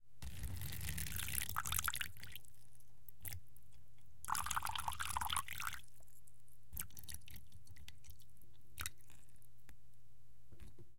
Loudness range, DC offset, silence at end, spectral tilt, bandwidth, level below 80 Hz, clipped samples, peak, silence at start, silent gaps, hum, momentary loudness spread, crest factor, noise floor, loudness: 12 LU; 0.6%; 0 s; -1.5 dB/octave; 17 kHz; -58 dBFS; under 0.1%; -16 dBFS; 0 s; none; none; 23 LU; 30 dB; -69 dBFS; -43 LUFS